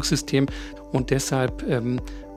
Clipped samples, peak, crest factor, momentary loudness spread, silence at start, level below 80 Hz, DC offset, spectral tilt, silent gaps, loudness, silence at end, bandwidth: under 0.1%; -6 dBFS; 18 dB; 7 LU; 0 s; -38 dBFS; under 0.1%; -5 dB/octave; none; -25 LUFS; 0 s; 15.5 kHz